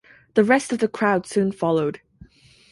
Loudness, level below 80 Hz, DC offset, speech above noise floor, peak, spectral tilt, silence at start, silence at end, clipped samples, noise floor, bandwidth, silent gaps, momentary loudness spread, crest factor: -21 LUFS; -60 dBFS; under 0.1%; 29 dB; -4 dBFS; -6 dB/octave; 0.35 s; 0.75 s; under 0.1%; -50 dBFS; 11.5 kHz; none; 6 LU; 18 dB